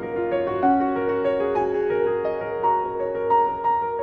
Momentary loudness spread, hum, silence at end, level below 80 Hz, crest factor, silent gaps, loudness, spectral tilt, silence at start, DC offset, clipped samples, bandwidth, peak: 5 LU; none; 0 s; -54 dBFS; 14 dB; none; -23 LUFS; -8.5 dB/octave; 0 s; under 0.1%; under 0.1%; 5.4 kHz; -8 dBFS